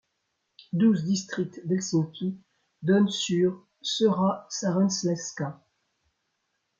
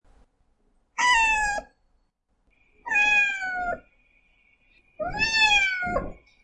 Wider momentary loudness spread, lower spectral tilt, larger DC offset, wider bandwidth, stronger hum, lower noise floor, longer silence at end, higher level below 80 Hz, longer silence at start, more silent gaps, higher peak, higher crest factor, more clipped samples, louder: second, 11 LU vs 18 LU; first, -5.5 dB/octave vs -1 dB/octave; neither; second, 7.6 kHz vs 11 kHz; neither; first, -78 dBFS vs -70 dBFS; first, 1.25 s vs 0.3 s; second, -70 dBFS vs -46 dBFS; second, 0.75 s vs 0.95 s; neither; about the same, -10 dBFS vs -8 dBFS; about the same, 16 dB vs 18 dB; neither; second, -27 LUFS vs -22 LUFS